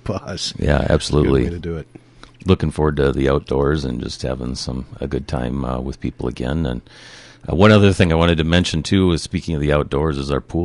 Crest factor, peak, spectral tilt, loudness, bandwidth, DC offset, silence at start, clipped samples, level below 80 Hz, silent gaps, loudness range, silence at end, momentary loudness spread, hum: 16 dB; -2 dBFS; -6.5 dB/octave; -19 LUFS; 11.5 kHz; under 0.1%; 0.05 s; under 0.1%; -28 dBFS; none; 8 LU; 0 s; 12 LU; none